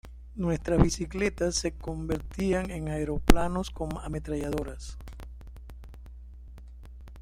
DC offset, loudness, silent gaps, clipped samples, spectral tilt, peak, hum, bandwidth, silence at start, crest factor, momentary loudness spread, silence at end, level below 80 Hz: under 0.1%; -30 LUFS; none; under 0.1%; -5.5 dB/octave; 0 dBFS; none; 16 kHz; 0.05 s; 30 dB; 23 LU; 0 s; -36 dBFS